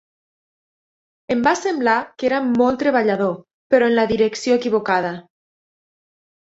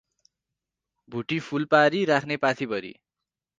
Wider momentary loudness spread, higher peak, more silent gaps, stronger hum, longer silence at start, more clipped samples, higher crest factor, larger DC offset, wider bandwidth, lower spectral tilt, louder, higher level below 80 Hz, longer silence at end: second, 7 LU vs 15 LU; about the same, -2 dBFS vs -4 dBFS; first, 3.53-3.70 s vs none; neither; first, 1.3 s vs 1.1 s; neither; about the same, 18 dB vs 22 dB; neither; second, 8 kHz vs 9.2 kHz; about the same, -5 dB/octave vs -5.5 dB/octave; first, -19 LUFS vs -24 LUFS; first, -56 dBFS vs -70 dBFS; first, 1.25 s vs 0.65 s